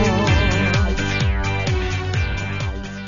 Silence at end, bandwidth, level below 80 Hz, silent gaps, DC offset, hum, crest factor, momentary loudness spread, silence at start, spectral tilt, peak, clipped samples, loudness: 0 s; 7.4 kHz; -26 dBFS; none; under 0.1%; none; 14 dB; 8 LU; 0 s; -5.5 dB/octave; -6 dBFS; under 0.1%; -20 LUFS